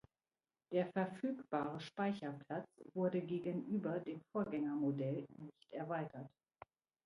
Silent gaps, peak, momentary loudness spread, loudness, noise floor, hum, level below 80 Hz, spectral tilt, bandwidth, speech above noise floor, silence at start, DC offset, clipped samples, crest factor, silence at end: none; -24 dBFS; 10 LU; -42 LUFS; under -90 dBFS; none; -82 dBFS; -8.5 dB/octave; 11 kHz; over 49 dB; 0.7 s; under 0.1%; under 0.1%; 18 dB; 0.75 s